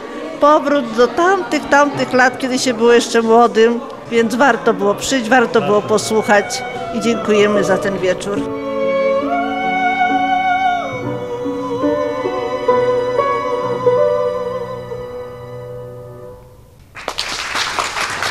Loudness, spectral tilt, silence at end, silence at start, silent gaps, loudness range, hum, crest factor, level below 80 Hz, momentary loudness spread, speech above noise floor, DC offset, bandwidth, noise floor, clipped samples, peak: -15 LUFS; -4 dB/octave; 0 s; 0 s; none; 8 LU; none; 16 dB; -48 dBFS; 13 LU; 28 dB; 0.2%; 15 kHz; -42 dBFS; under 0.1%; 0 dBFS